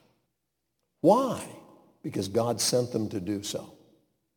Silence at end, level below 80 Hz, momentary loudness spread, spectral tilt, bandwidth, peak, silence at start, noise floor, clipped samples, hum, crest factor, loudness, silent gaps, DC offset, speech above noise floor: 0.65 s; -70 dBFS; 15 LU; -4.5 dB/octave; 19 kHz; -8 dBFS; 1.05 s; -81 dBFS; under 0.1%; none; 22 dB; -28 LUFS; none; under 0.1%; 54 dB